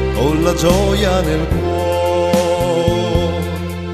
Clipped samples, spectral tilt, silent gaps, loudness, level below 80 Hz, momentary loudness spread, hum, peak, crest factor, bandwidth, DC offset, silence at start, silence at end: under 0.1%; -6 dB/octave; none; -16 LUFS; -24 dBFS; 5 LU; none; 0 dBFS; 14 dB; 14 kHz; under 0.1%; 0 s; 0 s